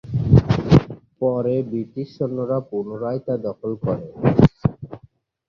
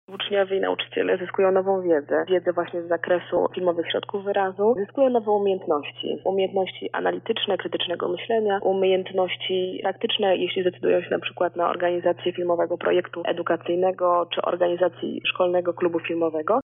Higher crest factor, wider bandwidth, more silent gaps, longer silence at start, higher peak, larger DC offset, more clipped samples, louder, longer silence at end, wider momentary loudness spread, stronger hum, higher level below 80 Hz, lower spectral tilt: about the same, 18 dB vs 14 dB; first, 6.8 kHz vs 3.9 kHz; neither; about the same, 0.05 s vs 0.1 s; first, -2 dBFS vs -8 dBFS; neither; neither; first, -21 LUFS vs -24 LUFS; first, 0.5 s vs 0 s; first, 12 LU vs 5 LU; neither; first, -36 dBFS vs -74 dBFS; first, -9.5 dB/octave vs -2.5 dB/octave